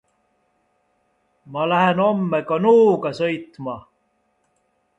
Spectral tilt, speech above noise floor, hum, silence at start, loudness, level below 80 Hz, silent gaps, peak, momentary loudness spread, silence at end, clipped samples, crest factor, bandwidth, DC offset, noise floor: -7.5 dB/octave; 49 dB; none; 1.45 s; -19 LUFS; -64 dBFS; none; -4 dBFS; 17 LU; 1.2 s; under 0.1%; 18 dB; 8 kHz; under 0.1%; -67 dBFS